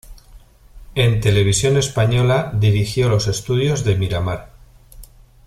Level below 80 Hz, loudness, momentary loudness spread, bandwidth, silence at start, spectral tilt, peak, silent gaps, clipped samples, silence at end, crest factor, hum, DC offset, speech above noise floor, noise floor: -38 dBFS; -18 LUFS; 6 LU; 14 kHz; 0.1 s; -5 dB/octave; -2 dBFS; none; under 0.1%; 0.4 s; 16 dB; none; under 0.1%; 28 dB; -45 dBFS